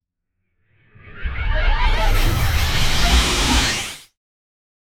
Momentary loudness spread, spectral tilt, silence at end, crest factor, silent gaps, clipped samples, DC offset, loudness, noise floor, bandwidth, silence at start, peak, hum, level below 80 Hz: 14 LU; -3 dB/octave; 1 s; 16 dB; none; under 0.1%; under 0.1%; -19 LUFS; -74 dBFS; 18 kHz; 1.05 s; -4 dBFS; none; -22 dBFS